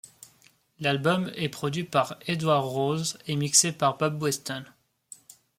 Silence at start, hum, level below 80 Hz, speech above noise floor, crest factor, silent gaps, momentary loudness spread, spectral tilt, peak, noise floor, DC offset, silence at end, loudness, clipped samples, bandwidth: 0.8 s; none; -68 dBFS; 35 dB; 22 dB; none; 11 LU; -3.5 dB/octave; -6 dBFS; -62 dBFS; under 0.1%; 0.95 s; -26 LUFS; under 0.1%; 16.5 kHz